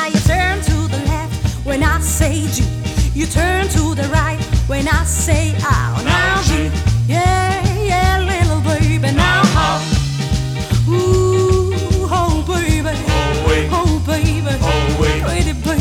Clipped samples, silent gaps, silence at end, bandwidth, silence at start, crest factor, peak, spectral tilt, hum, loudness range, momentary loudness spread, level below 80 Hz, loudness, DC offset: under 0.1%; none; 0 s; 17 kHz; 0 s; 12 dB; -2 dBFS; -5 dB/octave; none; 2 LU; 5 LU; -22 dBFS; -16 LUFS; under 0.1%